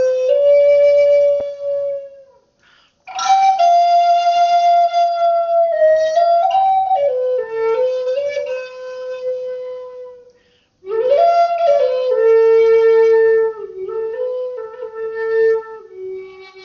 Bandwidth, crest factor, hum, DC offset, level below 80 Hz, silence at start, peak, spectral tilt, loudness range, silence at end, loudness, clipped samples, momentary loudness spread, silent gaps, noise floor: 7 kHz; 12 dB; none; under 0.1%; -64 dBFS; 0 s; -4 dBFS; 0.5 dB/octave; 8 LU; 0 s; -15 LUFS; under 0.1%; 17 LU; none; -57 dBFS